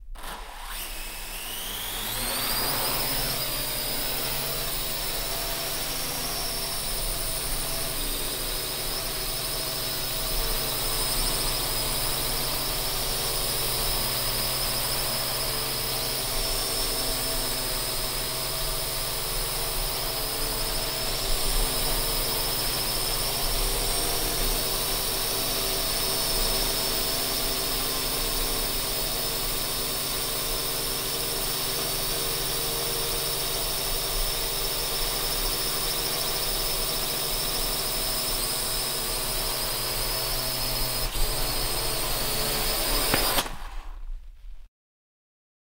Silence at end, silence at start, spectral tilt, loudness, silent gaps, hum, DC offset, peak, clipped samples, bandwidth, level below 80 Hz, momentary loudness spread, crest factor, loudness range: 1 s; 0 s; -1.5 dB/octave; -26 LUFS; none; none; under 0.1%; -6 dBFS; under 0.1%; 16 kHz; -36 dBFS; 3 LU; 22 dB; 3 LU